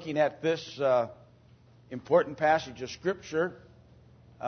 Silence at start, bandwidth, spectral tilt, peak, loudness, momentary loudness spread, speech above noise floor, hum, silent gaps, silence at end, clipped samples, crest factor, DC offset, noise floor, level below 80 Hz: 0 s; 6.6 kHz; -5.5 dB/octave; -10 dBFS; -29 LUFS; 11 LU; 29 dB; none; none; 0 s; under 0.1%; 20 dB; under 0.1%; -58 dBFS; -64 dBFS